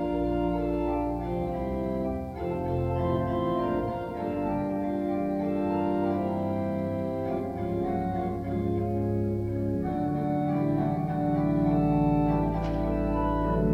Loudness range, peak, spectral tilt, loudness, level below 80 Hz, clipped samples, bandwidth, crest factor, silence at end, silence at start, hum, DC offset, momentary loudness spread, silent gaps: 3 LU; -14 dBFS; -10 dB/octave; -28 LUFS; -40 dBFS; under 0.1%; 13 kHz; 14 dB; 0 s; 0 s; none; under 0.1%; 6 LU; none